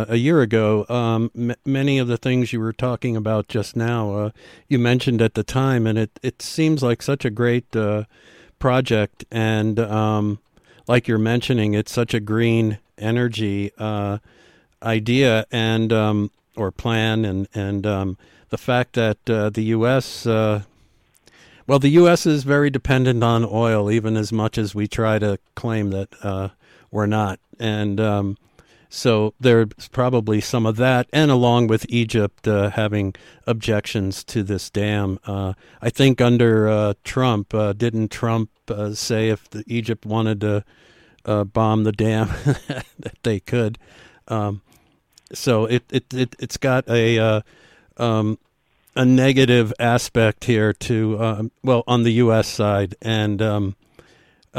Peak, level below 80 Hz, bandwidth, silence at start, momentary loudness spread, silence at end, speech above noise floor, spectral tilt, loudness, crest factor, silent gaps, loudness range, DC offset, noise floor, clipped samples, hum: -4 dBFS; -48 dBFS; 14 kHz; 0 s; 10 LU; 0 s; 42 dB; -6.5 dB/octave; -20 LUFS; 16 dB; none; 5 LU; under 0.1%; -61 dBFS; under 0.1%; none